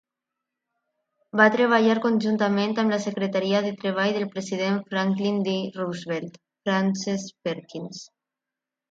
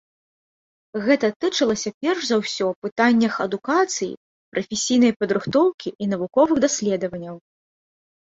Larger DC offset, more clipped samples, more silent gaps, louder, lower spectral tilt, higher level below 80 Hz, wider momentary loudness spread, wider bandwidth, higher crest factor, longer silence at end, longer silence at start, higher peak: neither; neither; second, none vs 1.36-1.40 s, 1.94-2.01 s, 2.76-2.82 s, 2.92-2.96 s, 4.17-4.52 s, 5.16-5.20 s, 5.74-5.78 s, 5.95-5.99 s; second, -24 LUFS vs -21 LUFS; first, -5.5 dB/octave vs -4 dB/octave; second, -74 dBFS vs -62 dBFS; about the same, 13 LU vs 12 LU; about the same, 7.8 kHz vs 8 kHz; about the same, 22 dB vs 18 dB; about the same, 0.85 s vs 0.9 s; first, 1.35 s vs 0.95 s; about the same, -2 dBFS vs -4 dBFS